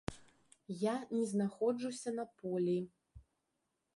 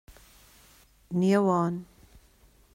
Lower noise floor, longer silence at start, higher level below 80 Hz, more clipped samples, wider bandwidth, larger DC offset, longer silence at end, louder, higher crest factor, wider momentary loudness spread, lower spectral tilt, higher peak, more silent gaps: first, -85 dBFS vs -60 dBFS; second, 0.1 s vs 1.1 s; second, -66 dBFS vs -60 dBFS; neither; second, 11.5 kHz vs 16 kHz; neither; second, 0.75 s vs 0.9 s; second, -38 LUFS vs -26 LUFS; about the same, 20 dB vs 18 dB; about the same, 10 LU vs 11 LU; about the same, -6.5 dB/octave vs -7.5 dB/octave; second, -20 dBFS vs -12 dBFS; neither